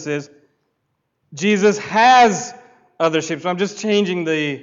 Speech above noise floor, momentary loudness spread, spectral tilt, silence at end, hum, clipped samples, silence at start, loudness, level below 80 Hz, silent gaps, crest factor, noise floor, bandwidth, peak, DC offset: 55 dB; 14 LU; -4 dB/octave; 0 s; none; under 0.1%; 0 s; -17 LUFS; -64 dBFS; none; 14 dB; -71 dBFS; 7.8 kHz; -4 dBFS; under 0.1%